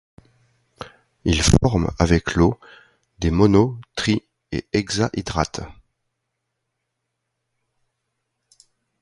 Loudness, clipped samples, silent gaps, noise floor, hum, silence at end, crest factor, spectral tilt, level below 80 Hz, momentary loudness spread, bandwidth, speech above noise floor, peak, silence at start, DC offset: -20 LUFS; under 0.1%; none; -78 dBFS; none; 3.3 s; 22 dB; -5.5 dB/octave; -34 dBFS; 21 LU; 11.5 kHz; 59 dB; 0 dBFS; 0.8 s; under 0.1%